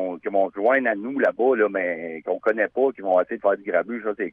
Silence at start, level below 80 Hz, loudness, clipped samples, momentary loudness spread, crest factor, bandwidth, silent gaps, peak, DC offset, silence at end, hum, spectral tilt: 0 s; -72 dBFS; -23 LUFS; under 0.1%; 7 LU; 14 dB; 4.7 kHz; none; -8 dBFS; under 0.1%; 0 s; none; -8 dB/octave